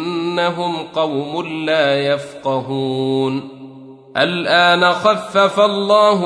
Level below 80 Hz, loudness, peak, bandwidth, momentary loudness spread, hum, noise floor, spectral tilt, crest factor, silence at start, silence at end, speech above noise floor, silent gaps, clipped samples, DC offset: -64 dBFS; -16 LUFS; -2 dBFS; 11 kHz; 10 LU; none; -38 dBFS; -5 dB/octave; 16 dB; 0 s; 0 s; 22 dB; none; under 0.1%; under 0.1%